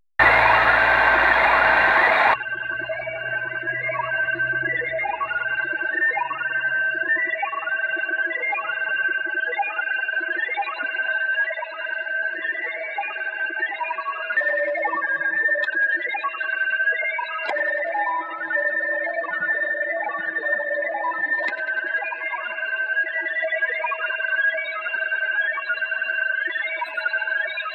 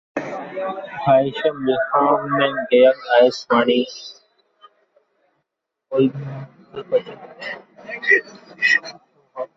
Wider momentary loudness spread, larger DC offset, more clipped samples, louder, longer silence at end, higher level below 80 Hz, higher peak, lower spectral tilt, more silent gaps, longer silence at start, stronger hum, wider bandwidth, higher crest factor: second, 10 LU vs 20 LU; neither; neither; second, -22 LUFS vs -18 LUFS; about the same, 0 s vs 0.1 s; first, -52 dBFS vs -64 dBFS; about the same, -2 dBFS vs -2 dBFS; about the same, -4.5 dB/octave vs -5.5 dB/octave; neither; about the same, 0.2 s vs 0.15 s; neither; first, 8.8 kHz vs 7.6 kHz; about the same, 22 dB vs 18 dB